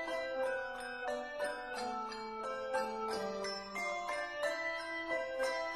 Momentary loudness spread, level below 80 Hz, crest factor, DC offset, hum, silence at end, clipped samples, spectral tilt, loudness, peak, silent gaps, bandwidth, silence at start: 4 LU; -68 dBFS; 16 dB; under 0.1%; none; 0 s; under 0.1%; -2.5 dB/octave; -39 LUFS; -24 dBFS; none; 14.5 kHz; 0 s